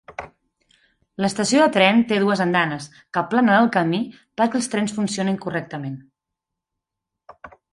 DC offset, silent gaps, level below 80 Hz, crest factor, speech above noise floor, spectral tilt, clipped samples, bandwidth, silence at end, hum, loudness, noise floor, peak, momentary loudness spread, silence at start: under 0.1%; none; -62 dBFS; 20 dB; 64 dB; -5 dB/octave; under 0.1%; 11.5 kHz; 0.25 s; none; -20 LUFS; -84 dBFS; -2 dBFS; 16 LU; 0.1 s